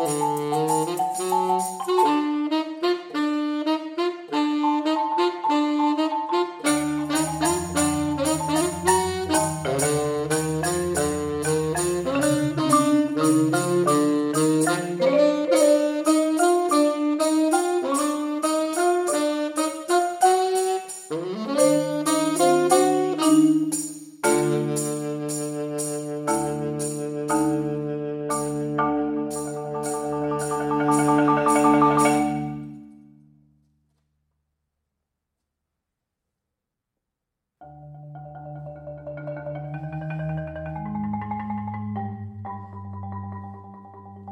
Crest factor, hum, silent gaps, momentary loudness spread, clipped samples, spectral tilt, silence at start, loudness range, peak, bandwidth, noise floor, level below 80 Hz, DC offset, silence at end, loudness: 18 dB; none; none; 14 LU; under 0.1%; -4.5 dB/octave; 0 s; 12 LU; -4 dBFS; 16 kHz; -83 dBFS; -56 dBFS; under 0.1%; 0 s; -23 LUFS